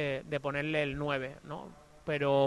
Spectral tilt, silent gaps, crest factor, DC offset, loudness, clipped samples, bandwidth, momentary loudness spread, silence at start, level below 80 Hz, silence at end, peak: -6.5 dB/octave; none; 18 dB; under 0.1%; -34 LUFS; under 0.1%; 11.5 kHz; 13 LU; 0 s; -58 dBFS; 0 s; -16 dBFS